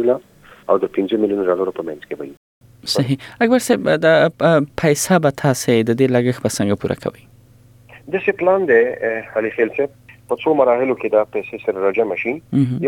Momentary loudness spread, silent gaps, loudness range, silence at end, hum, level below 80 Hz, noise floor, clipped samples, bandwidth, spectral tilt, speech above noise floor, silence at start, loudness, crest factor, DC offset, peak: 11 LU; 2.37-2.61 s; 4 LU; 0 s; none; -56 dBFS; -48 dBFS; under 0.1%; 18 kHz; -5.5 dB/octave; 31 dB; 0 s; -17 LUFS; 16 dB; under 0.1%; -2 dBFS